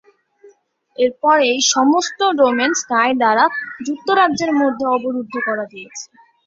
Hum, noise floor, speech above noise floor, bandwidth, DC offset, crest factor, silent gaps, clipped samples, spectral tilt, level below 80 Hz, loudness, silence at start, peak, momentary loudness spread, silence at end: none; -53 dBFS; 36 dB; 7.8 kHz; under 0.1%; 16 dB; none; under 0.1%; -2 dB/octave; -64 dBFS; -16 LUFS; 0.45 s; -2 dBFS; 12 LU; 0.4 s